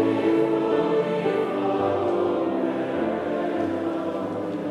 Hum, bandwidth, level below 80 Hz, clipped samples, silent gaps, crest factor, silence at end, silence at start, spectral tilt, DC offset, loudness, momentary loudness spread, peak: none; 10.5 kHz; -66 dBFS; under 0.1%; none; 14 dB; 0 s; 0 s; -7.5 dB/octave; under 0.1%; -24 LUFS; 6 LU; -10 dBFS